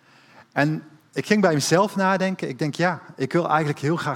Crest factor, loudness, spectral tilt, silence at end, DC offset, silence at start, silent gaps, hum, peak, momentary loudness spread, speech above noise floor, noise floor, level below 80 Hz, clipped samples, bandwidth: 20 dB; -22 LUFS; -5.5 dB/octave; 0 s; under 0.1%; 0.55 s; none; none; -2 dBFS; 10 LU; 30 dB; -52 dBFS; -68 dBFS; under 0.1%; 17 kHz